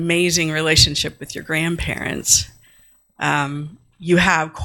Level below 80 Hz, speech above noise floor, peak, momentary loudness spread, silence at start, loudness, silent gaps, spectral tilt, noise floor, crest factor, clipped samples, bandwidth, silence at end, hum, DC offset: -38 dBFS; 34 dB; 0 dBFS; 18 LU; 0 s; -17 LUFS; none; -3 dB/octave; -53 dBFS; 18 dB; under 0.1%; 17 kHz; 0 s; none; under 0.1%